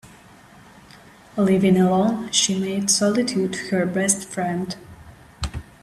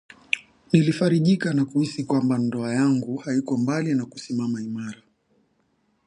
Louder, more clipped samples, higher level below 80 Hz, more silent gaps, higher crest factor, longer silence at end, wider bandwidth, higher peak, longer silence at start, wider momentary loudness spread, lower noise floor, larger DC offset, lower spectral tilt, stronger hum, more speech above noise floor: first, -21 LUFS vs -24 LUFS; neither; first, -46 dBFS vs -66 dBFS; neither; about the same, 18 dB vs 20 dB; second, 0.2 s vs 1.1 s; first, 13.5 kHz vs 11 kHz; about the same, -4 dBFS vs -4 dBFS; second, 0.05 s vs 0.35 s; first, 15 LU vs 8 LU; second, -48 dBFS vs -68 dBFS; neither; second, -4 dB/octave vs -6.5 dB/octave; neither; second, 27 dB vs 45 dB